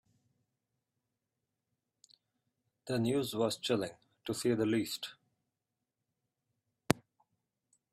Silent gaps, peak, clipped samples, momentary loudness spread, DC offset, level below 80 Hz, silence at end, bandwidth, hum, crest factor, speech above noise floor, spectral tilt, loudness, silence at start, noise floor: none; -4 dBFS; under 0.1%; 12 LU; under 0.1%; -72 dBFS; 0.95 s; 15.5 kHz; none; 36 dB; 55 dB; -5 dB/octave; -35 LUFS; 2.85 s; -89 dBFS